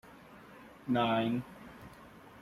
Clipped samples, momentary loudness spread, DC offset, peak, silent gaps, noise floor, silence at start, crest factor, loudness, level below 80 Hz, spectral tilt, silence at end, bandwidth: under 0.1%; 24 LU; under 0.1%; -20 dBFS; none; -54 dBFS; 0.05 s; 18 dB; -32 LUFS; -66 dBFS; -7 dB/octave; 0 s; 13.5 kHz